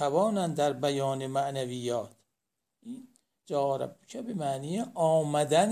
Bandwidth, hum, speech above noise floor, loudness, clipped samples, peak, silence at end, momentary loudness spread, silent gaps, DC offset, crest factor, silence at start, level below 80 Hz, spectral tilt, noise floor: 15.5 kHz; none; 57 dB; -30 LUFS; under 0.1%; -10 dBFS; 0 s; 17 LU; none; under 0.1%; 20 dB; 0 s; -76 dBFS; -5.5 dB/octave; -85 dBFS